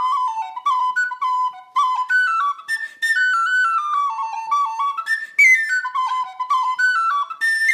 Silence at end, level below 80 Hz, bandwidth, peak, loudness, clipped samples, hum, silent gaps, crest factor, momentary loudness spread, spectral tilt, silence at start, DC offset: 0 s; under -90 dBFS; 15 kHz; -4 dBFS; -18 LUFS; under 0.1%; none; none; 16 dB; 8 LU; 4.5 dB/octave; 0 s; under 0.1%